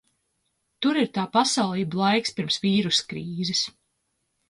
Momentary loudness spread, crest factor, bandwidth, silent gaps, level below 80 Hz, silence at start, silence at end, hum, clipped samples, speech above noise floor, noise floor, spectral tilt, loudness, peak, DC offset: 6 LU; 18 dB; 11.5 kHz; none; -66 dBFS; 0.8 s; 0.8 s; none; under 0.1%; 51 dB; -75 dBFS; -4 dB/octave; -24 LUFS; -8 dBFS; under 0.1%